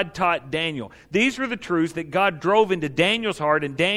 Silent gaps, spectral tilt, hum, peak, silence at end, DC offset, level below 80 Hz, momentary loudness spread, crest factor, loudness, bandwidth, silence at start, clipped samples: none; -5 dB/octave; none; -6 dBFS; 0 s; under 0.1%; -56 dBFS; 6 LU; 18 dB; -22 LUFS; 14 kHz; 0 s; under 0.1%